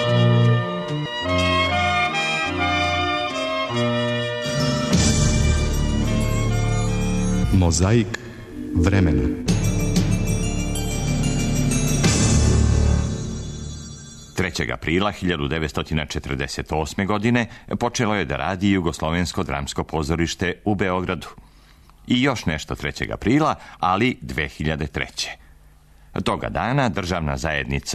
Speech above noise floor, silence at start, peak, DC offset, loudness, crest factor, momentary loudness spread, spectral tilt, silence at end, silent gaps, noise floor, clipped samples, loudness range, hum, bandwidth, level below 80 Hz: 28 dB; 0 s; -6 dBFS; under 0.1%; -21 LUFS; 14 dB; 9 LU; -5 dB/octave; 0 s; none; -50 dBFS; under 0.1%; 4 LU; none; 13.5 kHz; -30 dBFS